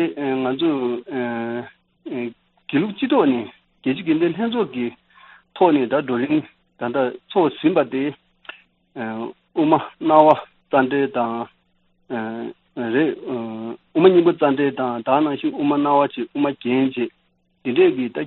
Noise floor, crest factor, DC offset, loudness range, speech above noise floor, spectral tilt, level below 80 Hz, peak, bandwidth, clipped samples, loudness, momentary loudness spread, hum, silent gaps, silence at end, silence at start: -63 dBFS; 20 dB; under 0.1%; 5 LU; 44 dB; -4.5 dB/octave; -66 dBFS; 0 dBFS; 4.2 kHz; under 0.1%; -20 LUFS; 15 LU; none; none; 0 s; 0 s